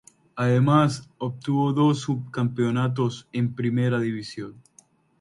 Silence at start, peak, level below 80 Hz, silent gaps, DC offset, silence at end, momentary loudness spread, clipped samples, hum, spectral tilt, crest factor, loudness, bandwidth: 0.35 s; -6 dBFS; -62 dBFS; none; under 0.1%; 0.65 s; 13 LU; under 0.1%; none; -7.5 dB/octave; 18 dB; -24 LUFS; 11 kHz